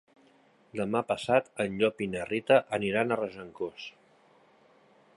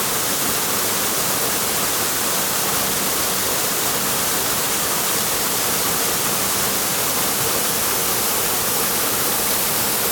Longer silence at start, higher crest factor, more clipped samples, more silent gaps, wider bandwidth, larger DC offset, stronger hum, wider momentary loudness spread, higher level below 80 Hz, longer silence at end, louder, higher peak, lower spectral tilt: first, 0.75 s vs 0 s; first, 22 dB vs 14 dB; neither; neither; second, 11.5 kHz vs 19.5 kHz; neither; neither; first, 13 LU vs 1 LU; second, -66 dBFS vs -48 dBFS; first, 1.25 s vs 0 s; second, -29 LUFS vs -17 LUFS; about the same, -8 dBFS vs -6 dBFS; first, -5.5 dB/octave vs -1 dB/octave